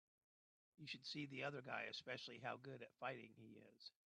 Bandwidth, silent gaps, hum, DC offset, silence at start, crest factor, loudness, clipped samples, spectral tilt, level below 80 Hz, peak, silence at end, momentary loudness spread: 10 kHz; none; none; under 0.1%; 0.8 s; 20 dB; -52 LUFS; under 0.1%; -4.5 dB/octave; under -90 dBFS; -34 dBFS; 0.25 s; 13 LU